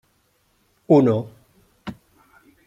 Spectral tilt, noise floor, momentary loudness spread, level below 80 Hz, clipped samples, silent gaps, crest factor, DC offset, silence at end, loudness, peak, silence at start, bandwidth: -9.5 dB/octave; -65 dBFS; 23 LU; -62 dBFS; under 0.1%; none; 20 dB; under 0.1%; 0.75 s; -18 LUFS; -2 dBFS; 0.9 s; 7.6 kHz